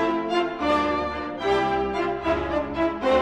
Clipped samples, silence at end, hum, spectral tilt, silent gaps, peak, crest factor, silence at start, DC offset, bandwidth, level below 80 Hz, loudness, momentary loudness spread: under 0.1%; 0 s; none; -6 dB/octave; none; -10 dBFS; 14 dB; 0 s; under 0.1%; 10 kHz; -44 dBFS; -24 LUFS; 4 LU